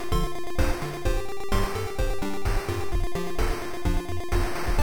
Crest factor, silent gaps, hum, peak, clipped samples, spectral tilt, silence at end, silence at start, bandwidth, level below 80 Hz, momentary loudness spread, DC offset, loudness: 16 dB; none; none; -10 dBFS; under 0.1%; -5.5 dB/octave; 0 s; 0 s; over 20 kHz; -28 dBFS; 3 LU; 2%; -30 LUFS